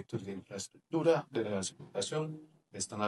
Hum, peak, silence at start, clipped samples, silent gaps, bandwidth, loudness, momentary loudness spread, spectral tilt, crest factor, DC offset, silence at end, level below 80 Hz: none; -16 dBFS; 0 s; under 0.1%; none; 12 kHz; -36 LUFS; 14 LU; -4.5 dB/octave; 20 dB; under 0.1%; 0 s; -82 dBFS